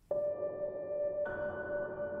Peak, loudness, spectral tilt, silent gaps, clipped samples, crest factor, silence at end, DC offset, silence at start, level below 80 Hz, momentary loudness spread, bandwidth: -24 dBFS; -38 LUFS; -9 dB/octave; none; under 0.1%; 14 dB; 0 s; under 0.1%; 0.1 s; -64 dBFS; 3 LU; 3.5 kHz